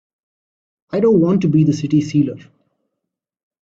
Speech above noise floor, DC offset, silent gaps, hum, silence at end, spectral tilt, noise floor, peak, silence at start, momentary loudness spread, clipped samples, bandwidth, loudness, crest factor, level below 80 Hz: 65 dB; under 0.1%; none; none; 1.2 s; -8.5 dB/octave; -80 dBFS; -4 dBFS; 0.95 s; 9 LU; under 0.1%; 7.8 kHz; -16 LUFS; 14 dB; -56 dBFS